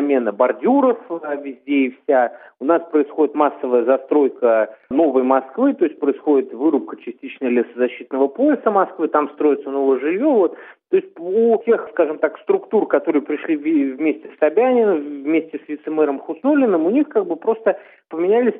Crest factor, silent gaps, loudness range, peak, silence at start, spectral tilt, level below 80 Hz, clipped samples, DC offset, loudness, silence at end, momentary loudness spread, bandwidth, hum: 16 dB; none; 2 LU; -2 dBFS; 0 s; -10.5 dB/octave; -74 dBFS; under 0.1%; under 0.1%; -18 LUFS; 0 s; 7 LU; 3.8 kHz; none